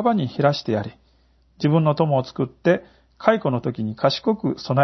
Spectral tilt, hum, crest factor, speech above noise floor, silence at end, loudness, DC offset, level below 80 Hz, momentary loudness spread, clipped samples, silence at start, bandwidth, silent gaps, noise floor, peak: -7.5 dB/octave; none; 20 dB; 38 dB; 0 s; -22 LUFS; under 0.1%; -58 dBFS; 7 LU; under 0.1%; 0 s; 6.2 kHz; none; -59 dBFS; -2 dBFS